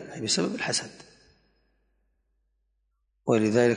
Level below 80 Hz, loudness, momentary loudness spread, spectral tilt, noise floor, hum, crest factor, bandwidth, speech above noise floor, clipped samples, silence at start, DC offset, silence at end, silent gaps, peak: -66 dBFS; -26 LUFS; 11 LU; -4 dB/octave; -74 dBFS; none; 20 dB; 11 kHz; 49 dB; under 0.1%; 0 s; under 0.1%; 0 s; none; -10 dBFS